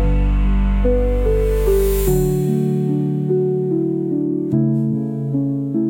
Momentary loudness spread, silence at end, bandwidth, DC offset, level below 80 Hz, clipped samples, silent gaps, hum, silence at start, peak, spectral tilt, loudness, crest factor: 4 LU; 0 s; 17 kHz; under 0.1%; -22 dBFS; under 0.1%; none; none; 0 s; -4 dBFS; -8.5 dB/octave; -18 LUFS; 12 dB